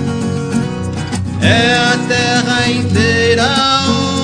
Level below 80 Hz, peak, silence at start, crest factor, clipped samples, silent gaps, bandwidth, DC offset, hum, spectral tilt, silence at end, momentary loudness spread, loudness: -40 dBFS; 0 dBFS; 0 s; 14 dB; under 0.1%; none; 10 kHz; under 0.1%; none; -4.5 dB/octave; 0 s; 9 LU; -13 LUFS